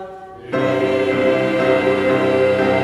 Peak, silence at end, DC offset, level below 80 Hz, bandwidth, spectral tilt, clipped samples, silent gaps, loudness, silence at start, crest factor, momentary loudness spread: -2 dBFS; 0 s; under 0.1%; -52 dBFS; 11.5 kHz; -6.5 dB/octave; under 0.1%; none; -17 LUFS; 0 s; 14 dB; 8 LU